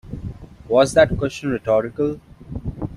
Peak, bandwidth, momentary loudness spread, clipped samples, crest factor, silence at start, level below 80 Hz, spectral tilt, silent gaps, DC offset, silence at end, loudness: -2 dBFS; 12 kHz; 19 LU; under 0.1%; 18 dB; 0.05 s; -38 dBFS; -6 dB/octave; none; under 0.1%; 0 s; -19 LUFS